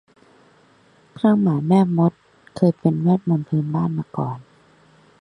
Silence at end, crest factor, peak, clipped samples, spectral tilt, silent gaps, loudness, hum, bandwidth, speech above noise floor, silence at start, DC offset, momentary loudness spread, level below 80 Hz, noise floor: 0.8 s; 18 dB; -2 dBFS; under 0.1%; -10 dB/octave; none; -20 LUFS; none; 9.8 kHz; 36 dB; 1.25 s; under 0.1%; 10 LU; -60 dBFS; -55 dBFS